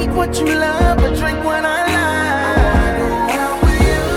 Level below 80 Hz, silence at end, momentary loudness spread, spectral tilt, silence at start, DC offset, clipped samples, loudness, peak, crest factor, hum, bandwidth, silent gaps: -20 dBFS; 0 s; 3 LU; -5.5 dB/octave; 0 s; under 0.1%; under 0.1%; -15 LUFS; 0 dBFS; 14 dB; none; 16 kHz; none